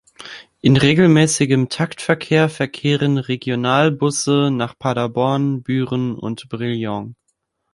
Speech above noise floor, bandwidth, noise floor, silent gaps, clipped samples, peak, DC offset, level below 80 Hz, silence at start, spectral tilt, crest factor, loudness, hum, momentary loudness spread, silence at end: 53 dB; 11.5 kHz; -70 dBFS; none; under 0.1%; 0 dBFS; under 0.1%; -52 dBFS; 0.2 s; -5.5 dB/octave; 18 dB; -18 LUFS; none; 13 LU; 0.6 s